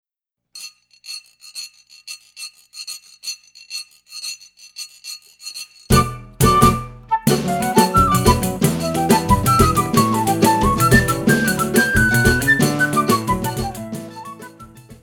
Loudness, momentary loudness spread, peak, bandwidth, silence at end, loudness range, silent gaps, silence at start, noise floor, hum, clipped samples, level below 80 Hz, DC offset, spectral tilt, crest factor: -16 LUFS; 20 LU; 0 dBFS; over 20 kHz; 0.1 s; 17 LU; none; 0.55 s; -82 dBFS; 60 Hz at -40 dBFS; under 0.1%; -32 dBFS; under 0.1%; -4.5 dB/octave; 18 dB